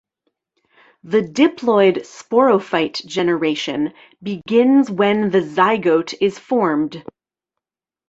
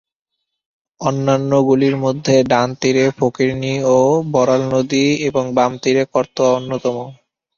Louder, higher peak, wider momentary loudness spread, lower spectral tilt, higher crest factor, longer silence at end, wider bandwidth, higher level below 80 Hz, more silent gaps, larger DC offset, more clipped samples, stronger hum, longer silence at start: about the same, -17 LUFS vs -16 LUFS; about the same, -2 dBFS vs -2 dBFS; first, 11 LU vs 7 LU; about the same, -5.5 dB/octave vs -6 dB/octave; about the same, 16 dB vs 16 dB; first, 1.05 s vs 0.45 s; about the same, 8 kHz vs 7.4 kHz; second, -62 dBFS vs -54 dBFS; neither; neither; neither; neither; about the same, 1.05 s vs 1 s